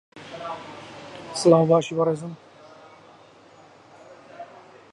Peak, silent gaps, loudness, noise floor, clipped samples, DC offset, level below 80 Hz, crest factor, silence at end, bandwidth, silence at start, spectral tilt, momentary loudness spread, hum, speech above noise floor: -4 dBFS; none; -22 LUFS; -51 dBFS; under 0.1%; under 0.1%; -70 dBFS; 22 dB; 0.5 s; 11.5 kHz; 0.15 s; -6 dB/octave; 25 LU; none; 31 dB